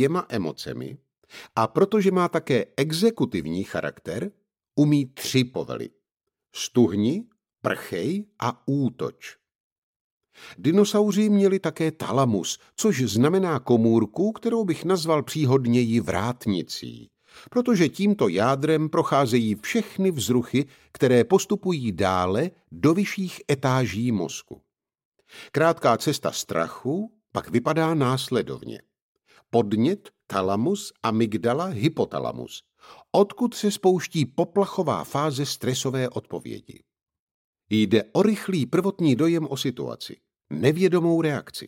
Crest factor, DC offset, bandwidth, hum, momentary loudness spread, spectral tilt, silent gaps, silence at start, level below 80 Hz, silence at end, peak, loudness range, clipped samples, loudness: 18 dB; under 0.1%; 16.5 kHz; none; 12 LU; -6 dB/octave; 9.55-10.21 s, 25.05-25.12 s, 29.02-29.15 s, 37.19-37.53 s; 0 s; -62 dBFS; 0 s; -6 dBFS; 4 LU; under 0.1%; -24 LUFS